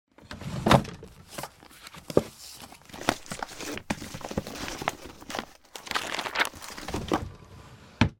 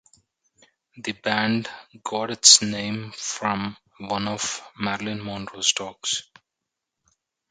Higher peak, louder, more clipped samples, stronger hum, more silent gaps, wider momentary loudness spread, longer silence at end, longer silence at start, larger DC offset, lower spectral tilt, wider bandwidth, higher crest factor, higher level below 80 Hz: about the same, -2 dBFS vs 0 dBFS; second, -30 LUFS vs -22 LUFS; neither; neither; neither; about the same, 19 LU vs 19 LU; second, 0.05 s vs 1.3 s; second, 0.2 s vs 0.95 s; neither; first, -4.5 dB/octave vs -1.5 dB/octave; first, 17.5 kHz vs 15 kHz; about the same, 30 dB vs 26 dB; first, -48 dBFS vs -62 dBFS